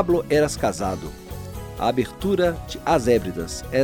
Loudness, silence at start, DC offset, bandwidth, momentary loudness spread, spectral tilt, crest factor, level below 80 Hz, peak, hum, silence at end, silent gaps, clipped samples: -23 LUFS; 0 s; under 0.1%; 19 kHz; 15 LU; -5.5 dB/octave; 16 dB; -40 dBFS; -6 dBFS; none; 0 s; none; under 0.1%